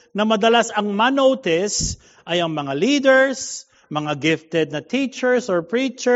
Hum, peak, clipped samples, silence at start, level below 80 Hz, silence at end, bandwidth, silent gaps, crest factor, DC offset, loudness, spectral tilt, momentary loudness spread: none; -4 dBFS; under 0.1%; 0.15 s; -46 dBFS; 0 s; 8 kHz; none; 16 dB; under 0.1%; -19 LUFS; -3 dB/octave; 11 LU